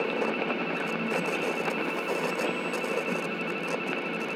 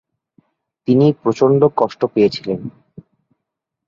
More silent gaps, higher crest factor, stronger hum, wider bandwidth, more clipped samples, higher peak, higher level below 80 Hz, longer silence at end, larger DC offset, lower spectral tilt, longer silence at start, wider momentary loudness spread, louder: neither; about the same, 16 dB vs 16 dB; neither; first, over 20 kHz vs 7.4 kHz; neither; second, -14 dBFS vs -2 dBFS; second, -90 dBFS vs -58 dBFS; second, 0 s vs 1.2 s; neither; second, -4.5 dB/octave vs -8 dB/octave; second, 0 s vs 0.9 s; second, 2 LU vs 13 LU; second, -29 LUFS vs -16 LUFS